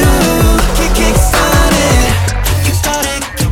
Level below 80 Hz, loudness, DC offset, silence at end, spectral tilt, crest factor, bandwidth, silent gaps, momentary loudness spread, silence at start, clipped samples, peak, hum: -14 dBFS; -11 LUFS; under 0.1%; 0 s; -4 dB/octave; 10 dB; 18 kHz; none; 4 LU; 0 s; under 0.1%; 0 dBFS; none